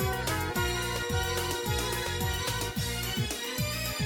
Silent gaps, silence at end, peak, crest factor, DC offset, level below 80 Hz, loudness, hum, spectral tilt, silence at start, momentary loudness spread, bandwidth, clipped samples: none; 0 s; -16 dBFS; 14 dB; under 0.1%; -42 dBFS; -30 LUFS; none; -3.5 dB/octave; 0 s; 2 LU; 17.5 kHz; under 0.1%